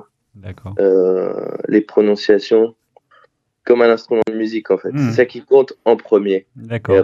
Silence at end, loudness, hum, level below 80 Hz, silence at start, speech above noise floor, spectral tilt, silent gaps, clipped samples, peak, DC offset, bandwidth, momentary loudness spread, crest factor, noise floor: 0 s; -16 LUFS; none; -60 dBFS; 0.45 s; 40 dB; -7.5 dB/octave; none; under 0.1%; 0 dBFS; under 0.1%; 7.4 kHz; 11 LU; 16 dB; -55 dBFS